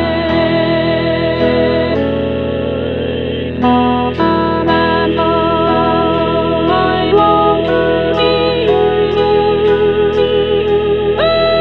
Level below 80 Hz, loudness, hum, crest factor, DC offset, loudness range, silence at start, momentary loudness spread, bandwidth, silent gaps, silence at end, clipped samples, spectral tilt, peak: -34 dBFS; -13 LUFS; none; 12 dB; 1%; 3 LU; 0 s; 5 LU; 5.6 kHz; none; 0 s; under 0.1%; -8.5 dB/octave; 0 dBFS